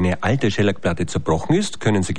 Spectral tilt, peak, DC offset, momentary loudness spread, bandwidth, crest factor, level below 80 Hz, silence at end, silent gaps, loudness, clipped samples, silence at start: -6 dB/octave; -6 dBFS; 3%; 4 LU; 11 kHz; 14 dB; -42 dBFS; 0 s; none; -20 LUFS; under 0.1%; 0 s